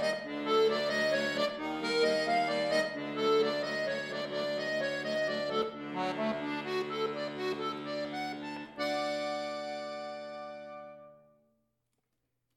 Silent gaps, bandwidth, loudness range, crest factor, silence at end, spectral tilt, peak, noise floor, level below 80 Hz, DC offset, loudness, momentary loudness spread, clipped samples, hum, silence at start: none; 15.5 kHz; 8 LU; 18 dB; 1.4 s; -4 dB/octave; -16 dBFS; -82 dBFS; -74 dBFS; under 0.1%; -33 LUFS; 12 LU; under 0.1%; none; 0 s